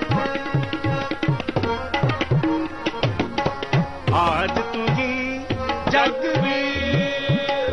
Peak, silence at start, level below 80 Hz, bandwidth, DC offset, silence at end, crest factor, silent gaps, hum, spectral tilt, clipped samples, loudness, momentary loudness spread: -6 dBFS; 0 s; -42 dBFS; 9.4 kHz; under 0.1%; 0 s; 16 dB; none; none; -6.5 dB/octave; under 0.1%; -22 LUFS; 5 LU